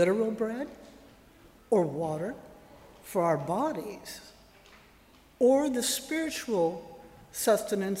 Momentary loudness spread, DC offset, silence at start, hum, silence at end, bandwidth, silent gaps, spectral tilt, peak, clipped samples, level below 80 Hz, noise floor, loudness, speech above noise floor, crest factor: 18 LU; under 0.1%; 0 s; none; 0 s; 16 kHz; none; -4.5 dB/octave; -14 dBFS; under 0.1%; -64 dBFS; -58 dBFS; -29 LUFS; 30 dB; 18 dB